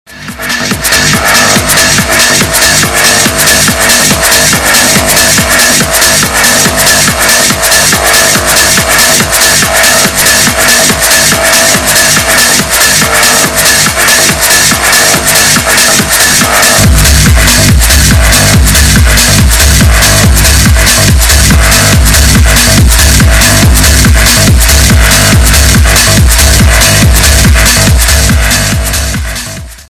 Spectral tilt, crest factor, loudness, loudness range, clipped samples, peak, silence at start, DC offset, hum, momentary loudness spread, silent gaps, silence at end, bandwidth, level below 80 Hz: -2.5 dB/octave; 4 dB; -3 LUFS; 0 LU; 9%; 0 dBFS; 0.1 s; under 0.1%; none; 1 LU; none; 0.1 s; 16 kHz; -12 dBFS